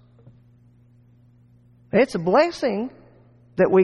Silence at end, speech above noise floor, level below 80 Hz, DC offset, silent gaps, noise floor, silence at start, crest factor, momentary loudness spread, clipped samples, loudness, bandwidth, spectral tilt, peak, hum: 0 s; 35 dB; -58 dBFS; under 0.1%; none; -54 dBFS; 1.95 s; 16 dB; 13 LU; under 0.1%; -22 LUFS; 11.5 kHz; -6.5 dB/octave; -6 dBFS; 60 Hz at -50 dBFS